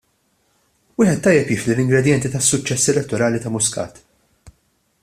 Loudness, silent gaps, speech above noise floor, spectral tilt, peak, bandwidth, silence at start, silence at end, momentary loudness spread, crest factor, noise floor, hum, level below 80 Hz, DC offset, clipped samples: -17 LUFS; none; 47 dB; -4.5 dB/octave; 0 dBFS; 15 kHz; 1 s; 1.1 s; 4 LU; 20 dB; -64 dBFS; none; -50 dBFS; under 0.1%; under 0.1%